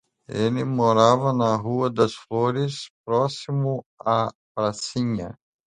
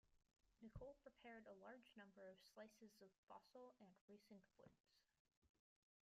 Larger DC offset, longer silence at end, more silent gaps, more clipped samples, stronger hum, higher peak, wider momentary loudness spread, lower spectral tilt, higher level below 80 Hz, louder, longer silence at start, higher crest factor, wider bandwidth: neither; second, 0.35 s vs 0.55 s; first, 2.90-3.04 s, 3.86-3.98 s, 4.35-4.55 s vs 3.18-3.27 s, 4.01-4.08 s, 4.80-4.84 s, 5.20-5.25 s, 5.37-5.42 s; neither; neither; first, -2 dBFS vs -46 dBFS; first, 11 LU vs 7 LU; about the same, -6.5 dB/octave vs -5.5 dB/octave; first, -58 dBFS vs -80 dBFS; first, -23 LUFS vs -65 LUFS; first, 0.3 s vs 0.05 s; about the same, 20 dB vs 20 dB; second, 10.5 kHz vs 13 kHz